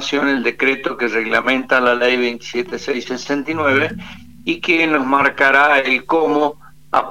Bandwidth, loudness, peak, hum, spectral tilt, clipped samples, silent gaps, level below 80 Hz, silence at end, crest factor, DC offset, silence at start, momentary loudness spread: 16 kHz; -16 LUFS; 0 dBFS; none; -4 dB/octave; under 0.1%; none; -52 dBFS; 0 s; 16 dB; 0.7%; 0 s; 10 LU